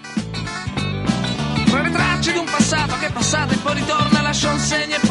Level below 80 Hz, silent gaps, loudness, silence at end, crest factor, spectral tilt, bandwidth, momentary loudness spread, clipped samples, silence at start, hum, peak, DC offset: -38 dBFS; none; -19 LUFS; 0 s; 18 dB; -4 dB/octave; 11.5 kHz; 8 LU; under 0.1%; 0 s; none; -2 dBFS; under 0.1%